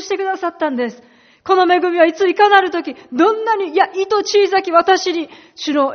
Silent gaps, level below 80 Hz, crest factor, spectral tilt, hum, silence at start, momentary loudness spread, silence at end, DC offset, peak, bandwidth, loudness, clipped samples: none; -64 dBFS; 16 dB; 0 dB/octave; none; 0 s; 12 LU; 0 s; under 0.1%; 0 dBFS; 6.6 kHz; -15 LUFS; under 0.1%